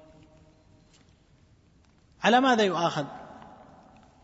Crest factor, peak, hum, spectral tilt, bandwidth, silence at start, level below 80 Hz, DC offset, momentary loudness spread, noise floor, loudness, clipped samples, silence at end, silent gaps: 22 dB; -8 dBFS; none; -4.5 dB/octave; 8 kHz; 2.2 s; -66 dBFS; under 0.1%; 25 LU; -61 dBFS; -24 LUFS; under 0.1%; 0.9 s; none